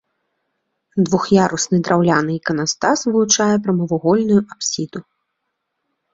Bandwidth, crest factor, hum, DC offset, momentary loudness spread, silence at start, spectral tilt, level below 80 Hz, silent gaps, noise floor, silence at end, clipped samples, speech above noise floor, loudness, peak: 7.8 kHz; 16 dB; none; under 0.1%; 8 LU; 0.95 s; -4.5 dB/octave; -56 dBFS; none; -75 dBFS; 1.15 s; under 0.1%; 58 dB; -17 LUFS; -2 dBFS